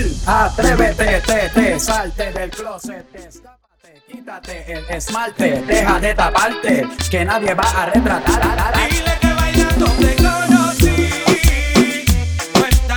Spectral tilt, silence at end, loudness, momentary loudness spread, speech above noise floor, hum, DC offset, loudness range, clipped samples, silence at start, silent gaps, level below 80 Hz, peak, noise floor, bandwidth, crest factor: -4.5 dB/octave; 0 s; -15 LUFS; 12 LU; 35 dB; none; under 0.1%; 10 LU; under 0.1%; 0 s; none; -22 dBFS; 0 dBFS; -51 dBFS; over 20 kHz; 16 dB